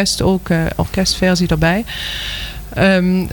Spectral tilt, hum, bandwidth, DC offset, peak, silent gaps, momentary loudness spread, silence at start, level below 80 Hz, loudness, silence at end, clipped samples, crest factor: -5 dB/octave; none; 19 kHz; under 0.1%; -4 dBFS; none; 9 LU; 0 s; -30 dBFS; -16 LUFS; 0 s; under 0.1%; 12 dB